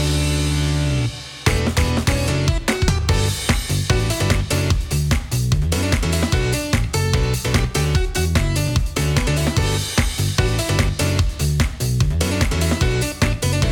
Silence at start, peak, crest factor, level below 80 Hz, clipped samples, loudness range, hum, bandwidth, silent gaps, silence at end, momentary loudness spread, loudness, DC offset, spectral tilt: 0 s; -2 dBFS; 16 dB; -24 dBFS; under 0.1%; 0 LU; none; 18.5 kHz; none; 0 s; 2 LU; -19 LUFS; under 0.1%; -4.5 dB/octave